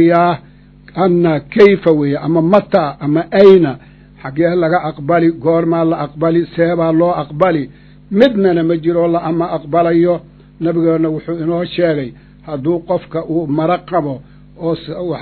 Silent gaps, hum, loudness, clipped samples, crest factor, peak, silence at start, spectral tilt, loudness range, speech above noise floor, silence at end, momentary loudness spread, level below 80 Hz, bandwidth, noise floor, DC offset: none; 50 Hz at -40 dBFS; -14 LUFS; 0.4%; 14 dB; 0 dBFS; 0 s; -9.5 dB/octave; 6 LU; 28 dB; 0 s; 11 LU; -46 dBFS; 6 kHz; -41 dBFS; under 0.1%